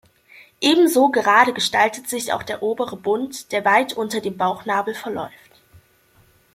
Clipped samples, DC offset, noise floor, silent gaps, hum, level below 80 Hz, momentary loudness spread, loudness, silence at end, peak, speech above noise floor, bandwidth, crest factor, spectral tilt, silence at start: under 0.1%; under 0.1%; -56 dBFS; none; none; -64 dBFS; 12 LU; -19 LUFS; 1.25 s; -2 dBFS; 37 dB; 16.5 kHz; 20 dB; -3 dB/octave; 0.6 s